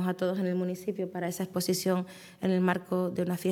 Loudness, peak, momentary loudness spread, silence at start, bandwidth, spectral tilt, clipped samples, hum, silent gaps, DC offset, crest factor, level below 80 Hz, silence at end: -31 LUFS; -12 dBFS; 6 LU; 0 s; 17.5 kHz; -6 dB/octave; under 0.1%; none; none; under 0.1%; 18 dB; -78 dBFS; 0 s